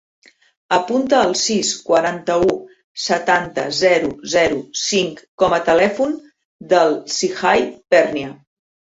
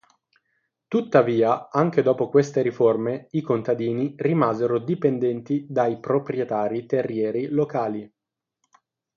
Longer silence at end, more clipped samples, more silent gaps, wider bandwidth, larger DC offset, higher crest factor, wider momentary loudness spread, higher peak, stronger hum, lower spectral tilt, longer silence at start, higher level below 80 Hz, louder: second, 0.5 s vs 1.1 s; neither; first, 2.84-2.95 s, 5.28-5.38 s, 6.45-6.59 s vs none; first, 8 kHz vs 7.2 kHz; neither; about the same, 16 dB vs 20 dB; about the same, 7 LU vs 6 LU; about the same, -2 dBFS vs -2 dBFS; neither; second, -3 dB/octave vs -8 dB/octave; second, 0.7 s vs 0.9 s; first, -52 dBFS vs -68 dBFS; first, -17 LUFS vs -23 LUFS